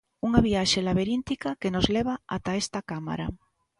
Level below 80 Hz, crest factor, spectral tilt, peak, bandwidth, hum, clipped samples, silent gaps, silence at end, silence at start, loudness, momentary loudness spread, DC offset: -44 dBFS; 22 dB; -5 dB/octave; -4 dBFS; 11.5 kHz; none; under 0.1%; none; 0.45 s; 0.25 s; -27 LUFS; 10 LU; under 0.1%